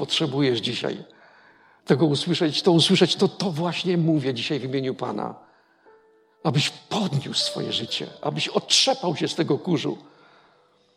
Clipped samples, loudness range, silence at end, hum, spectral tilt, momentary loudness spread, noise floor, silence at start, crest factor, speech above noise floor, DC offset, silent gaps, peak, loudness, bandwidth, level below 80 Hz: under 0.1%; 5 LU; 0.95 s; none; -4.5 dB/octave; 11 LU; -60 dBFS; 0 s; 22 dB; 37 dB; under 0.1%; none; -4 dBFS; -23 LUFS; 13.5 kHz; -70 dBFS